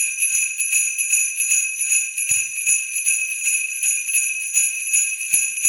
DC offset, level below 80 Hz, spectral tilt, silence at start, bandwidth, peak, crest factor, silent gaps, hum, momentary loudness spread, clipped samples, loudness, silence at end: under 0.1%; -64 dBFS; 4.5 dB/octave; 0 s; 17.5 kHz; -2 dBFS; 18 dB; none; none; 2 LU; under 0.1%; -17 LUFS; 0 s